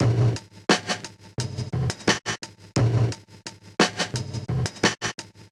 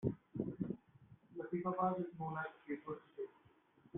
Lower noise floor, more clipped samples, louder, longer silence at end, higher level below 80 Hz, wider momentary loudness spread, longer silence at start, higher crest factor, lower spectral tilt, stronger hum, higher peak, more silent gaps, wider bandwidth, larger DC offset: second, -43 dBFS vs -70 dBFS; neither; first, -25 LUFS vs -44 LUFS; about the same, 0.05 s vs 0 s; first, -46 dBFS vs -72 dBFS; about the same, 11 LU vs 13 LU; about the same, 0 s vs 0 s; about the same, 22 dB vs 20 dB; about the same, -4.5 dB/octave vs -5 dB/octave; neither; first, -4 dBFS vs -24 dBFS; neither; first, 12 kHz vs 3.8 kHz; neither